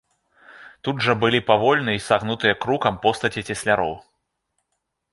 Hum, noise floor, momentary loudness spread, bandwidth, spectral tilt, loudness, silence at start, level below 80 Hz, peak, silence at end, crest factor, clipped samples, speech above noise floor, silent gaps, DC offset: none; -77 dBFS; 9 LU; 11.5 kHz; -5 dB/octave; -21 LUFS; 0.5 s; -54 dBFS; -2 dBFS; 1.15 s; 20 dB; under 0.1%; 56 dB; none; under 0.1%